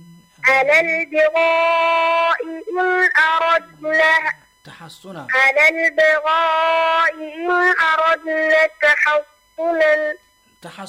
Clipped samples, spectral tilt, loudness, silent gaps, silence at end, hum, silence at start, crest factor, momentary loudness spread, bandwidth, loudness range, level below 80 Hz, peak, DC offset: under 0.1%; -3 dB/octave; -15 LUFS; none; 0 s; none; 0.45 s; 12 dB; 9 LU; 15 kHz; 2 LU; -62 dBFS; -6 dBFS; under 0.1%